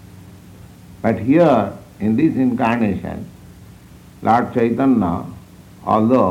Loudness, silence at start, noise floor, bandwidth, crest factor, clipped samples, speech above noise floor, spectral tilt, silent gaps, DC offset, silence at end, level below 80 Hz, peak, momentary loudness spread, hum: -17 LUFS; 0.05 s; -42 dBFS; 14.5 kHz; 18 dB; under 0.1%; 26 dB; -8.5 dB/octave; none; under 0.1%; 0 s; -48 dBFS; -2 dBFS; 15 LU; none